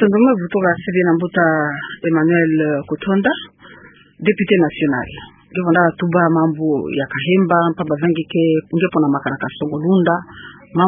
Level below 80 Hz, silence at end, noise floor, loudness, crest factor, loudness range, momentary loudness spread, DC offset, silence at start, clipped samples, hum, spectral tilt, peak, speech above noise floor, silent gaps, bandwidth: -54 dBFS; 0 s; -43 dBFS; -17 LUFS; 16 dB; 2 LU; 9 LU; under 0.1%; 0 s; under 0.1%; none; -12.5 dB/octave; 0 dBFS; 27 dB; none; 3.7 kHz